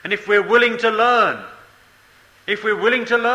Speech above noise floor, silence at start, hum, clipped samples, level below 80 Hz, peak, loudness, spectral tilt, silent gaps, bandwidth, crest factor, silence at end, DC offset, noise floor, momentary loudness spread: 34 dB; 0.05 s; none; under 0.1%; -62 dBFS; -2 dBFS; -17 LUFS; -4 dB/octave; none; 12 kHz; 16 dB; 0 s; under 0.1%; -51 dBFS; 10 LU